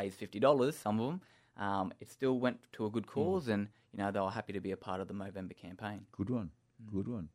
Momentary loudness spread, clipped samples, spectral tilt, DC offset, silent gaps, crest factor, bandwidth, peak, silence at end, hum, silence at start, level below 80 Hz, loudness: 13 LU; under 0.1%; -7 dB/octave; under 0.1%; none; 22 dB; 15.5 kHz; -14 dBFS; 0.05 s; none; 0 s; -70 dBFS; -37 LUFS